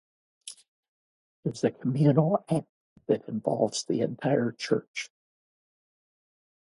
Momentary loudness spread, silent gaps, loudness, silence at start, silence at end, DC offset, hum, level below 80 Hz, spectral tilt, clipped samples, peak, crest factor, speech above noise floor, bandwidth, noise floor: 21 LU; 0.68-1.43 s, 2.69-2.96 s, 4.88-4.94 s; -28 LUFS; 0.45 s; 1.6 s; under 0.1%; none; -72 dBFS; -6.5 dB/octave; under 0.1%; -8 dBFS; 22 dB; over 63 dB; 11.5 kHz; under -90 dBFS